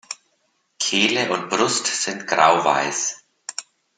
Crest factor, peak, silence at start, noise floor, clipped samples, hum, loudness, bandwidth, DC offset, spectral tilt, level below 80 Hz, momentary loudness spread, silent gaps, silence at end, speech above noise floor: 22 dB; -2 dBFS; 0.1 s; -68 dBFS; under 0.1%; none; -19 LUFS; 10.5 kHz; under 0.1%; -1.5 dB/octave; -70 dBFS; 18 LU; none; 0.35 s; 48 dB